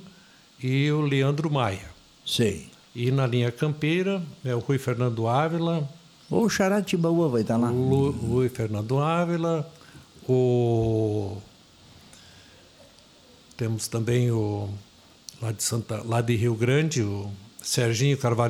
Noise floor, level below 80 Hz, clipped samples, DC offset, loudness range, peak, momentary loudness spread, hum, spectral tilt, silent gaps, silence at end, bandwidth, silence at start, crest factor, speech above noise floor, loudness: -54 dBFS; -56 dBFS; under 0.1%; under 0.1%; 6 LU; -8 dBFS; 12 LU; none; -6 dB/octave; none; 0 s; 15.5 kHz; 0 s; 18 dB; 29 dB; -25 LUFS